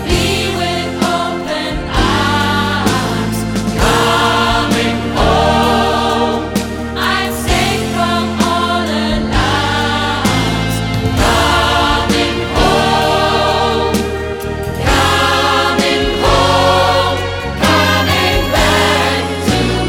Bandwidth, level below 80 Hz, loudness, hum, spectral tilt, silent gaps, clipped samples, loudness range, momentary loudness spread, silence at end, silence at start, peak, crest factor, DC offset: 18 kHz; -26 dBFS; -13 LUFS; none; -4.5 dB/octave; none; under 0.1%; 3 LU; 6 LU; 0 s; 0 s; 0 dBFS; 14 dB; under 0.1%